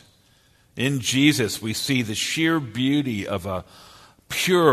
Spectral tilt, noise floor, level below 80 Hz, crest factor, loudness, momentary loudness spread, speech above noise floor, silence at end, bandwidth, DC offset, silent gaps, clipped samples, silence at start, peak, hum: -4 dB/octave; -58 dBFS; -56 dBFS; 20 dB; -22 LUFS; 11 LU; 37 dB; 0 s; 13.5 kHz; under 0.1%; none; under 0.1%; 0.75 s; -2 dBFS; none